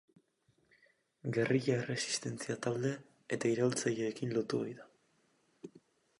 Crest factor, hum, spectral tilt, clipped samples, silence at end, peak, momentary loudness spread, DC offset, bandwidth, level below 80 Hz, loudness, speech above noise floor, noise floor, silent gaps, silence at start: 20 dB; none; -5 dB/octave; under 0.1%; 0.4 s; -18 dBFS; 20 LU; under 0.1%; 11.5 kHz; -78 dBFS; -35 LUFS; 40 dB; -75 dBFS; none; 1.25 s